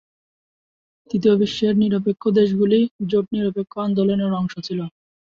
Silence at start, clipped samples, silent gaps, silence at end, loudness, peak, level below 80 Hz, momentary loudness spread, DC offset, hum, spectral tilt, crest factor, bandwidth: 1.15 s; under 0.1%; 2.91-2.99 s; 0.5 s; -20 LUFS; -6 dBFS; -58 dBFS; 10 LU; under 0.1%; none; -8 dB/octave; 16 dB; 7.2 kHz